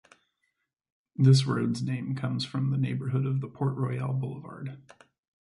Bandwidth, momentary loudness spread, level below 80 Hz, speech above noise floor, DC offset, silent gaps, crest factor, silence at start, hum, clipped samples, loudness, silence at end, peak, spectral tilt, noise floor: 11 kHz; 18 LU; -66 dBFS; 52 dB; under 0.1%; none; 20 dB; 1.2 s; none; under 0.1%; -28 LUFS; 0.65 s; -10 dBFS; -7 dB/octave; -79 dBFS